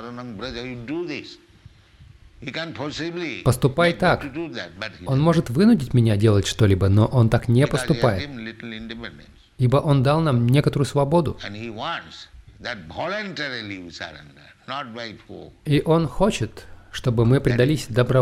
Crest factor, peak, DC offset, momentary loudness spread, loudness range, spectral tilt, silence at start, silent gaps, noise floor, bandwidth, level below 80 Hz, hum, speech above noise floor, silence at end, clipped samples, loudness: 16 dB; -6 dBFS; under 0.1%; 17 LU; 12 LU; -6.5 dB/octave; 0 s; none; -50 dBFS; 14 kHz; -44 dBFS; none; 29 dB; 0 s; under 0.1%; -21 LUFS